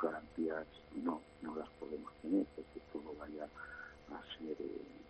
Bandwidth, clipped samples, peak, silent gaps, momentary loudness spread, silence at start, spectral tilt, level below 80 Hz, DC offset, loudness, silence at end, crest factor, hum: 8.2 kHz; under 0.1%; -24 dBFS; none; 12 LU; 0 s; -7 dB/octave; -68 dBFS; under 0.1%; -44 LUFS; 0 s; 20 dB; none